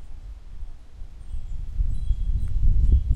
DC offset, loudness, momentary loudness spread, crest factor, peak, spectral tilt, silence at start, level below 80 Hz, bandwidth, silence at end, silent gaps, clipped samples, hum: under 0.1%; -28 LUFS; 21 LU; 14 dB; -8 dBFS; -8.5 dB/octave; 0 s; -24 dBFS; 3.5 kHz; 0 s; none; under 0.1%; none